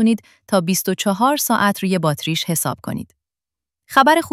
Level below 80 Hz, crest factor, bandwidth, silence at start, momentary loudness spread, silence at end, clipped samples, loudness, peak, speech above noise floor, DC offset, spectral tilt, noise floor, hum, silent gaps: -58 dBFS; 18 dB; 16.5 kHz; 0 s; 10 LU; 0.05 s; under 0.1%; -18 LUFS; 0 dBFS; 71 dB; under 0.1%; -4 dB/octave; -89 dBFS; none; none